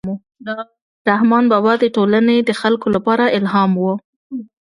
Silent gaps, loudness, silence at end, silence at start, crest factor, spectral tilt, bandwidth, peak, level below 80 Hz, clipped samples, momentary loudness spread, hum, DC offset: 0.82-1.05 s, 4.04-4.30 s; -15 LUFS; 0.25 s; 0.05 s; 16 dB; -7 dB/octave; 11 kHz; 0 dBFS; -58 dBFS; under 0.1%; 15 LU; none; under 0.1%